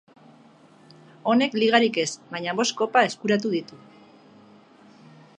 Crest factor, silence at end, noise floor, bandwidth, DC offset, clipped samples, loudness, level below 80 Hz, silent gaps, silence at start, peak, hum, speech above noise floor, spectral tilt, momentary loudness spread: 24 dB; 1.65 s; -53 dBFS; 10 kHz; under 0.1%; under 0.1%; -23 LUFS; -76 dBFS; none; 1.25 s; -2 dBFS; none; 30 dB; -3.5 dB/octave; 11 LU